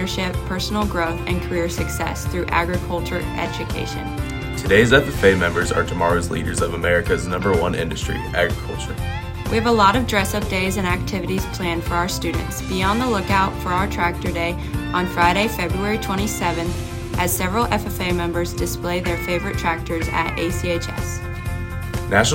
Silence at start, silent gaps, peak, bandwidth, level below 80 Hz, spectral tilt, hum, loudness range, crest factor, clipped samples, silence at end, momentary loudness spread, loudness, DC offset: 0 s; none; -2 dBFS; 16.5 kHz; -32 dBFS; -5 dB/octave; none; 4 LU; 20 dB; under 0.1%; 0 s; 10 LU; -21 LUFS; under 0.1%